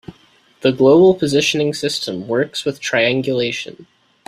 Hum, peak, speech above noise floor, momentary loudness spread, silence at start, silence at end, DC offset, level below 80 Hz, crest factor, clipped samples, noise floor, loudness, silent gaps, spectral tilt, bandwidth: none; -2 dBFS; 37 dB; 11 LU; 0.1 s; 0.45 s; under 0.1%; -56 dBFS; 16 dB; under 0.1%; -53 dBFS; -16 LUFS; none; -4.5 dB/octave; 14 kHz